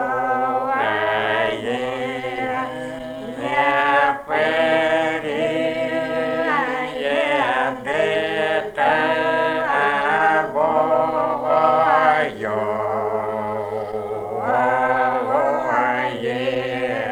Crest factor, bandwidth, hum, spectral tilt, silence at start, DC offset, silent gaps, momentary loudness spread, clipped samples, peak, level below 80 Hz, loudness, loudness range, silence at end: 16 dB; 14.5 kHz; none; -5 dB/octave; 0 s; under 0.1%; none; 8 LU; under 0.1%; -4 dBFS; -56 dBFS; -20 LUFS; 3 LU; 0 s